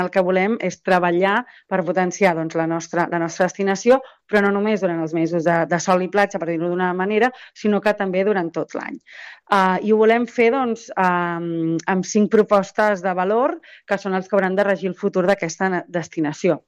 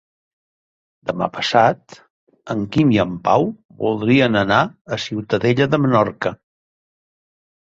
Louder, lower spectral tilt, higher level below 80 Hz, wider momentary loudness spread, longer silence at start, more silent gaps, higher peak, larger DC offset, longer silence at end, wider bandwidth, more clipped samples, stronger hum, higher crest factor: about the same, -20 LUFS vs -18 LUFS; about the same, -5.5 dB/octave vs -6.5 dB/octave; second, -64 dBFS vs -52 dBFS; second, 7 LU vs 11 LU; second, 0 s vs 1.05 s; second, none vs 2.10-2.27 s, 3.65-3.69 s, 4.81-4.85 s; about the same, -4 dBFS vs -2 dBFS; neither; second, 0.1 s vs 1.4 s; first, 11 kHz vs 7.8 kHz; neither; neither; about the same, 16 dB vs 18 dB